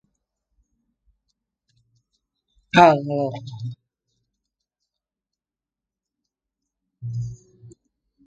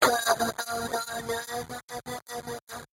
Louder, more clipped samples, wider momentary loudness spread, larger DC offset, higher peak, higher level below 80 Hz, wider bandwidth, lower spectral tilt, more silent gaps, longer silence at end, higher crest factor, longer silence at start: first, -19 LUFS vs -31 LUFS; neither; first, 21 LU vs 13 LU; neither; first, 0 dBFS vs -8 dBFS; about the same, -60 dBFS vs -60 dBFS; second, 9 kHz vs 16.5 kHz; first, -6.5 dB/octave vs -2 dB/octave; second, none vs 1.83-1.88 s, 2.62-2.67 s; first, 0.6 s vs 0.15 s; about the same, 26 dB vs 24 dB; first, 2.75 s vs 0 s